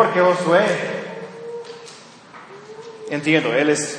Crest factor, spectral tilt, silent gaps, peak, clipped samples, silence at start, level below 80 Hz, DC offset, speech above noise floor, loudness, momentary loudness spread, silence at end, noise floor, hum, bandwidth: 20 dB; -4.5 dB/octave; none; -2 dBFS; under 0.1%; 0 s; -72 dBFS; under 0.1%; 25 dB; -18 LUFS; 23 LU; 0 s; -42 dBFS; none; 10.5 kHz